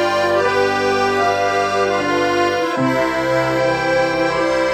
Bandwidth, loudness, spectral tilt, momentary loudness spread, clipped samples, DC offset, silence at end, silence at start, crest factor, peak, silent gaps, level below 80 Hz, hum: 15 kHz; -17 LUFS; -4.5 dB/octave; 1 LU; under 0.1%; under 0.1%; 0 s; 0 s; 12 dB; -4 dBFS; none; -48 dBFS; none